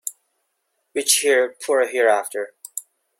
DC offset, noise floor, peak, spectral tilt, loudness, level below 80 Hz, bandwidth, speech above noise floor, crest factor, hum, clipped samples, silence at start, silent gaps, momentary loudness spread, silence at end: under 0.1%; -73 dBFS; -2 dBFS; 1 dB/octave; -19 LUFS; -76 dBFS; 16.5 kHz; 54 dB; 22 dB; none; under 0.1%; 0.05 s; none; 17 LU; 0.4 s